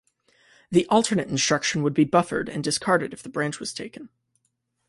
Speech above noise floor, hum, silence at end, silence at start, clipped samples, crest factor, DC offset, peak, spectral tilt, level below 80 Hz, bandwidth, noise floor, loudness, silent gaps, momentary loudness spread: 51 dB; none; 0.8 s; 0.7 s; under 0.1%; 20 dB; under 0.1%; -6 dBFS; -4 dB/octave; -62 dBFS; 11.5 kHz; -74 dBFS; -23 LUFS; none; 12 LU